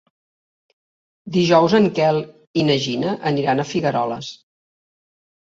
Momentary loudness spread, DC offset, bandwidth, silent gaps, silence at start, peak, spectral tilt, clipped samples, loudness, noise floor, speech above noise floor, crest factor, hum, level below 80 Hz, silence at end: 11 LU; under 0.1%; 7.8 kHz; 2.47-2.54 s; 1.25 s; -2 dBFS; -6 dB/octave; under 0.1%; -19 LUFS; under -90 dBFS; over 72 dB; 20 dB; none; -60 dBFS; 1.25 s